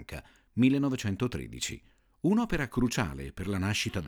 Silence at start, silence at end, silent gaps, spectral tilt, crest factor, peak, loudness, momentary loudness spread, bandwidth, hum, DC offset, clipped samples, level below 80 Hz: 0 s; 0 s; none; -5.5 dB/octave; 18 dB; -12 dBFS; -30 LUFS; 13 LU; 19.5 kHz; none; under 0.1%; under 0.1%; -48 dBFS